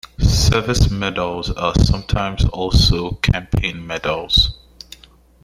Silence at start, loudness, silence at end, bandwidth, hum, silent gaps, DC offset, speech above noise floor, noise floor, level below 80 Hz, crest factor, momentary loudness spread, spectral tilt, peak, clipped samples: 0.2 s; -18 LUFS; 0.9 s; 15.5 kHz; none; none; under 0.1%; 30 dB; -47 dBFS; -24 dBFS; 16 dB; 9 LU; -5 dB/octave; -2 dBFS; under 0.1%